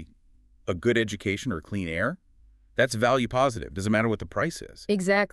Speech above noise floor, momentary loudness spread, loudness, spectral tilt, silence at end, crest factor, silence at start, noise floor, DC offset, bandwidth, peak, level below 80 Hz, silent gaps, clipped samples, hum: 32 dB; 10 LU; -26 LUFS; -5.5 dB/octave; 0.05 s; 20 dB; 0 s; -58 dBFS; under 0.1%; 13 kHz; -8 dBFS; -50 dBFS; none; under 0.1%; none